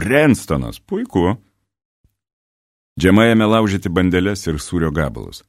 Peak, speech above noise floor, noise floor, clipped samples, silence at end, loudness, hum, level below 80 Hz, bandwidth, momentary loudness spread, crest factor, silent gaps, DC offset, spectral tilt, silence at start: 0 dBFS; over 74 dB; under -90 dBFS; under 0.1%; 0.1 s; -17 LUFS; none; -38 dBFS; 15.5 kHz; 12 LU; 18 dB; 1.85-2.04 s, 2.33-2.96 s; under 0.1%; -6 dB/octave; 0 s